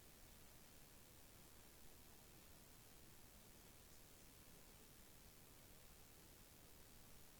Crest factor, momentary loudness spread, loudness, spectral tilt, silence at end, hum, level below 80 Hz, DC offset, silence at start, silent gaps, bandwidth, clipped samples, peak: 20 dB; 0 LU; -64 LUFS; -3 dB/octave; 0 s; none; -72 dBFS; under 0.1%; 0 s; none; over 20 kHz; under 0.1%; -44 dBFS